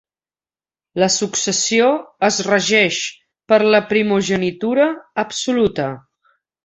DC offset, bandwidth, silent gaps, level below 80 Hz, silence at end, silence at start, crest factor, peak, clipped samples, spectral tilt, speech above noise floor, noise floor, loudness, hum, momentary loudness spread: under 0.1%; 8.4 kHz; none; -56 dBFS; 0.65 s; 0.95 s; 16 dB; -2 dBFS; under 0.1%; -3 dB/octave; over 73 dB; under -90 dBFS; -17 LUFS; none; 10 LU